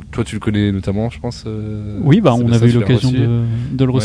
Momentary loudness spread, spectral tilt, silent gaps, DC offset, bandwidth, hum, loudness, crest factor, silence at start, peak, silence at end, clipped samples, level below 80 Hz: 12 LU; -7.5 dB/octave; none; under 0.1%; 10.5 kHz; none; -16 LUFS; 14 dB; 0 s; 0 dBFS; 0 s; under 0.1%; -36 dBFS